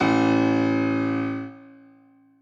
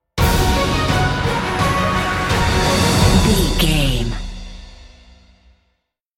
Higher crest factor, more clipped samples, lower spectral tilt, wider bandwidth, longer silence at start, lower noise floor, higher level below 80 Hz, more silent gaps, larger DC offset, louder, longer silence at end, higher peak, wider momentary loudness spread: about the same, 14 dB vs 16 dB; neither; first, -7 dB/octave vs -4.5 dB/octave; second, 7.2 kHz vs 16.5 kHz; second, 0 s vs 0.15 s; second, -55 dBFS vs -69 dBFS; second, -64 dBFS vs -24 dBFS; neither; neither; second, -23 LUFS vs -16 LUFS; second, 0.75 s vs 1.3 s; second, -10 dBFS vs -2 dBFS; about the same, 12 LU vs 11 LU